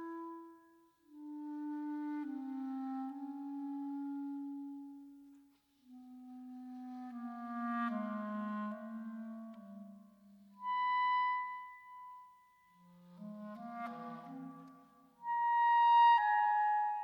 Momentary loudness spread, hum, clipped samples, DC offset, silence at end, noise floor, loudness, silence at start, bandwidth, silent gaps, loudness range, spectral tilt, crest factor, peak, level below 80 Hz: 23 LU; none; under 0.1%; under 0.1%; 0 s; -68 dBFS; -36 LUFS; 0 s; 18.5 kHz; none; 16 LU; -6 dB/octave; 18 dB; -20 dBFS; under -90 dBFS